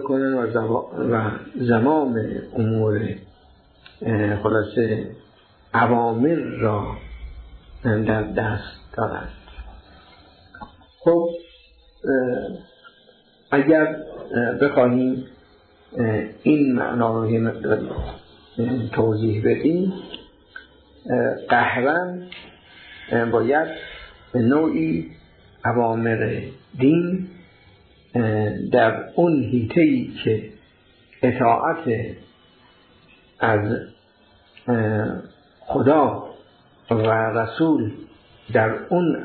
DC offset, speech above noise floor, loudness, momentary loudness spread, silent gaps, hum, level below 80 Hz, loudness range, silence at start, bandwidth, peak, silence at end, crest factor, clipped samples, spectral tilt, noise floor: under 0.1%; 35 dB; -21 LUFS; 19 LU; none; none; -48 dBFS; 5 LU; 0 s; 4.5 kHz; -4 dBFS; 0 s; 18 dB; under 0.1%; -11.5 dB/octave; -55 dBFS